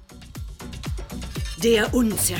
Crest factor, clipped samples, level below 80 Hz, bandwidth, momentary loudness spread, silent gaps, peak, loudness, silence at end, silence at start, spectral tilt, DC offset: 18 dB; under 0.1%; -36 dBFS; 19.5 kHz; 19 LU; none; -6 dBFS; -23 LUFS; 0 s; 0 s; -4 dB/octave; under 0.1%